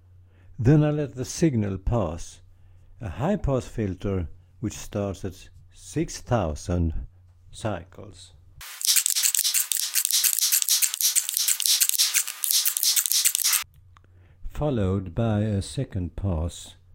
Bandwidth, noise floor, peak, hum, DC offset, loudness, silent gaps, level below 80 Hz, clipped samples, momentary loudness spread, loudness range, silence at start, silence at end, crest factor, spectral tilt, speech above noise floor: 17 kHz; -53 dBFS; 0 dBFS; none; under 0.1%; -23 LUFS; none; -42 dBFS; under 0.1%; 16 LU; 11 LU; 0.5 s; 0.2 s; 26 dB; -3 dB/octave; 27 dB